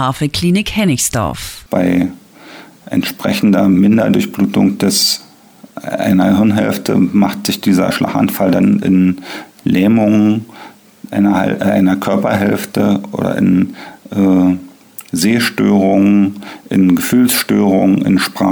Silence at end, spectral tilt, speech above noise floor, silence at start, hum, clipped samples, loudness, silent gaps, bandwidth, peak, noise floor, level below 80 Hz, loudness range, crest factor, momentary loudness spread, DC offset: 0 s; -5.5 dB/octave; 29 dB; 0 s; none; under 0.1%; -13 LUFS; none; over 20 kHz; -2 dBFS; -41 dBFS; -46 dBFS; 2 LU; 10 dB; 10 LU; under 0.1%